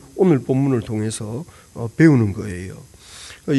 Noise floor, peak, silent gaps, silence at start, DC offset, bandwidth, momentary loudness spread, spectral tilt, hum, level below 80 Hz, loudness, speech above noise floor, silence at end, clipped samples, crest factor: -40 dBFS; -2 dBFS; none; 0.15 s; under 0.1%; 12 kHz; 23 LU; -7 dB/octave; none; -50 dBFS; -19 LUFS; 22 dB; 0 s; under 0.1%; 18 dB